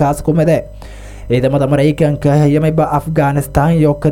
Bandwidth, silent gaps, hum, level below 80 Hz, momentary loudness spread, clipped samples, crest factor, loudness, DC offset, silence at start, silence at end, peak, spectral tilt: 16 kHz; none; none; -32 dBFS; 11 LU; under 0.1%; 12 dB; -13 LUFS; under 0.1%; 0 s; 0 s; 0 dBFS; -8 dB/octave